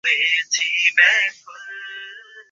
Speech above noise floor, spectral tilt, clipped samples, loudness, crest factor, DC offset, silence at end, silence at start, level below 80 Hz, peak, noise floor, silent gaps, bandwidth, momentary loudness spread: 21 dB; 4 dB/octave; under 0.1%; -16 LUFS; 18 dB; under 0.1%; 0.1 s; 0.05 s; -86 dBFS; -2 dBFS; -40 dBFS; none; 7.8 kHz; 22 LU